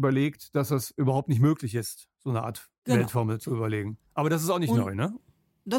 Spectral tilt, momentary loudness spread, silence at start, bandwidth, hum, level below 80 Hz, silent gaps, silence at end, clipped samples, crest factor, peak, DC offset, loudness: -6.5 dB/octave; 12 LU; 0 s; 17 kHz; none; -64 dBFS; 2.78-2.82 s; 0 s; under 0.1%; 16 dB; -10 dBFS; under 0.1%; -28 LUFS